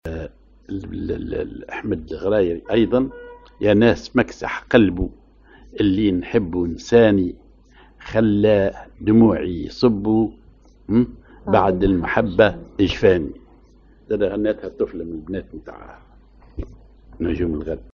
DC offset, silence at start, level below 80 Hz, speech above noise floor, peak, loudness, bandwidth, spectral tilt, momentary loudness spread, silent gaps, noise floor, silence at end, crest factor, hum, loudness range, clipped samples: under 0.1%; 0.05 s; -40 dBFS; 31 dB; 0 dBFS; -20 LUFS; 7.2 kHz; -6 dB/octave; 16 LU; none; -50 dBFS; 0.1 s; 20 dB; none; 8 LU; under 0.1%